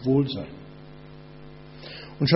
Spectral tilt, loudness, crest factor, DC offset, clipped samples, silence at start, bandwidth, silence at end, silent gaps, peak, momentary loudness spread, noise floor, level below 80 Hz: -6 dB/octave; -29 LUFS; 24 dB; under 0.1%; under 0.1%; 0 s; 6 kHz; 0 s; none; -4 dBFS; 22 LU; -45 dBFS; -54 dBFS